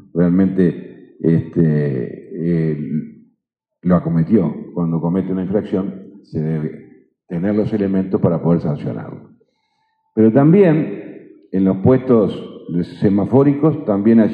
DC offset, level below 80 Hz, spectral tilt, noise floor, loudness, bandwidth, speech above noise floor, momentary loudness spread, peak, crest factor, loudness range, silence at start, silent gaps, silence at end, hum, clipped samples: under 0.1%; -52 dBFS; -11.5 dB/octave; -75 dBFS; -17 LUFS; 4.8 kHz; 59 dB; 14 LU; 0 dBFS; 16 dB; 5 LU; 0.15 s; none; 0 s; none; under 0.1%